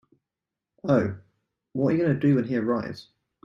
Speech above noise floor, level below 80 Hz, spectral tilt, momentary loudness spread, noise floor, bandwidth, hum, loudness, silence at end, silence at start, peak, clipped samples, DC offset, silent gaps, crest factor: 64 dB; -64 dBFS; -9 dB/octave; 14 LU; -88 dBFS; 7 kHz; none; -25 LUFS; 0.45 s; 0.85 s; -8 dBFS; under 0.1%; under 0.1%; none; 18 dB